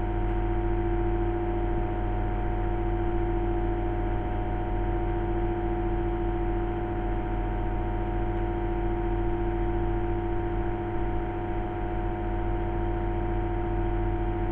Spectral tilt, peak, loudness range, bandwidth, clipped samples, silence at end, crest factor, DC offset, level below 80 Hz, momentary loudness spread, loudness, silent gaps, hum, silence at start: -10.5 dB/octave; -16 dBFS; 1 LU; 3.5 kHz; under 0.1%; 0 s; 12 dB; under 0.1%; -30 dBFS; 2 LU; -30 LUFS; none; none; 0 s